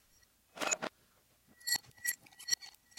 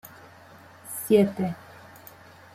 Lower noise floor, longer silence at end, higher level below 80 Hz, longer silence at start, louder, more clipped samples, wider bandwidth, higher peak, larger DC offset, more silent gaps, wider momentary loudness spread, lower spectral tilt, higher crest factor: first, -70 dBFS vs -50 dBFS; second, 0.3 s vs 1 s; second, -78 dBFS vs -66 dBFS; first, 0.55 s vs 0.05 s; second, -37 LUFS vs -25 LUFS; neither; about the same, 16.5 kHz vs 16 kHz; second, -16 dBFS vs -8 dBFS; neither; neither; second, 9 LU vs 26 LU; second, 0.5 dB/octave vs -6 dB/octave; first, 26 dB vs 20 dB